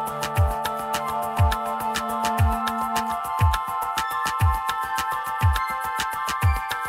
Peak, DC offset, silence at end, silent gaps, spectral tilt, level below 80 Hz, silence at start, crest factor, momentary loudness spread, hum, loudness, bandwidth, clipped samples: -8 dBFS; under 0.1%; 0 s; none; -4.5 dB/octave; -32 dBFS; 0 s; 14 dB; 4 LU; none; -24 LUFS; 16 kHz; under 0.1%